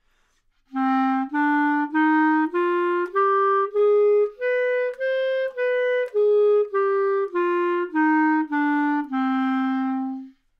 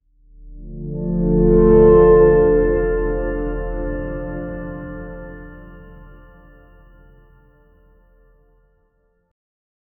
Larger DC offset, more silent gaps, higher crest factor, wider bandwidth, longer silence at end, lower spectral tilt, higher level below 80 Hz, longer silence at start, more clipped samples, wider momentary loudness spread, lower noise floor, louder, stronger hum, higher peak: neither; neither; second, 10 dB vs 18 dB; first, 5.6 kHz vs 3.3 kHz; second, 0.3 s vs 3.95 s; second, -5.5 dB/octave vs -13.5 dB/octave; second, -68 dBFS vs -28 dBFS; first, 0.75 s vs 0.4 s; neither; second, 5 LU vs 23 LU; about the same, -65 dBFS vs -63 dBFS; second, -21 LUFS vs -16 LUFS; neither; second, -12 dBFS vs 0 dBFS